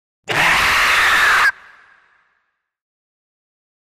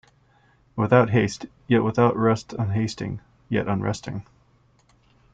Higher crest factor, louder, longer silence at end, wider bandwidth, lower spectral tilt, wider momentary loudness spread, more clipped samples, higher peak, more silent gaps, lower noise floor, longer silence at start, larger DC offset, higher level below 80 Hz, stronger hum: second, 14 dB vs 20 dB; first, -13 LUFS vs -23 LUFS; first, 2.3 s vs 1.1 s; first, 15.5 kHz vs 9 kHz; second, -1 dB/octave vs -7 dB/octave; second, 5 LU vs 17 LU; neither; about the same, -4 dBFS vs -4 dBFS; neither; first, -70 dBFS vs -60 dBFS; second, 0.3 s vs 0.75 s; neither; first, -44 dBFS vs -54 dBFS; neither